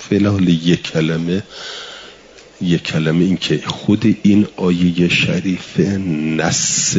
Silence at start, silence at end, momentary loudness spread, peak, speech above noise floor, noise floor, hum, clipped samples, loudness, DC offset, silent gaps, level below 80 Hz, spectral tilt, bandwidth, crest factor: 0 s; 0 s; 10 LU; -2 dBFS; 26 dB; -42 dBFS; none; under 0.1%; -16 LUFS; under 0.1%; none; -50 dBFS; -4.5 dB/octave; 7.8 kHz; 14 dB